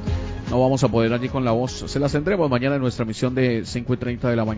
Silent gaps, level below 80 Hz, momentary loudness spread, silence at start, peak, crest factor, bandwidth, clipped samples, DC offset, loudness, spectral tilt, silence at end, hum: none; -36 dBFS; 6 LU; 0 s; -4 dBFS; 18 dB; 8 kHz; under 0.1%; under 0.1%; -22 LUFS; -6.5 dB/octave; 0 s; none